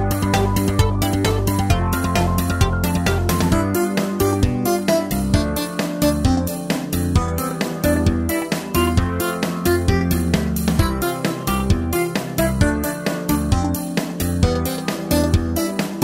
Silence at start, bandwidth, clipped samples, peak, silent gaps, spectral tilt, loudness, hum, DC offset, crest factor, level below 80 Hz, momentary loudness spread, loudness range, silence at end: 0 s; 16.5 kHz; under 0.1%; -2 dBFS; none; -5.5 dB/octave; -20 LUFS; none; under 0.1%; 16 dB; -28 dBFS; 4 LU; 2 LU; 0 s